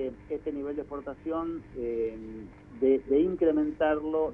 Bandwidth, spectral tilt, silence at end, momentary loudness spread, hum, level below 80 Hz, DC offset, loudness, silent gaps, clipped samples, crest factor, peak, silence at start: 3.6 kHz; -9 dB/octave; 0 s; 14 LU; none; -54 dBFS; under 0.1%; -29 LUFS; none; under 0.1%; 16 dB; -14 dBFS; 0 s